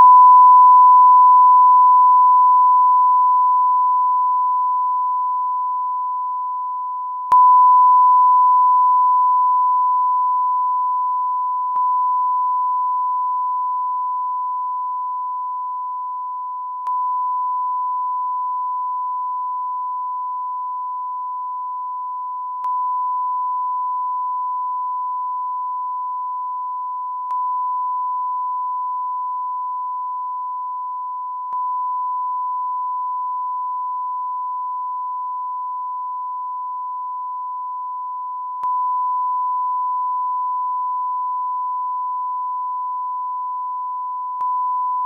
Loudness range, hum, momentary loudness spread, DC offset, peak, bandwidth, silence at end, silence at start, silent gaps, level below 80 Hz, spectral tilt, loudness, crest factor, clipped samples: 12 LU; none; 15 LU; under 0.1%; -4 dBFS; 1.5 kHz; 0 s; 0 s; none; -82 dBFS; -3 dB/octave; -18 LUFS; 14 dB; under 0.1%